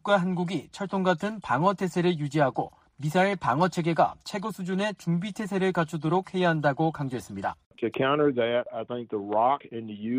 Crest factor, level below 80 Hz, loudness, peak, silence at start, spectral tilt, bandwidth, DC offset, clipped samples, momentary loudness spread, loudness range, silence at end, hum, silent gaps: 18 dB; -64 dBFS; -27 LUFS; -10 dBFS; 0.05 s; -6.5 dB/octave; 15.5 kHz; under 0.1%; under 0.1%; 10 LU; 2 LU; 0 s; none; 7.66-7.71 s